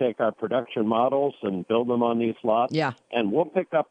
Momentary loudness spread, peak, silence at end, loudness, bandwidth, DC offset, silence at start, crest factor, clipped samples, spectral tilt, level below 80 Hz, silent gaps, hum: 4 LU; -8 dBFS; 0.1 s; -25 LUFS; 8.6 kHz; under 0.1%; 0 s; 16 dB; under 0.1%; -7.5 dB/octave; -72 dBFS; none; none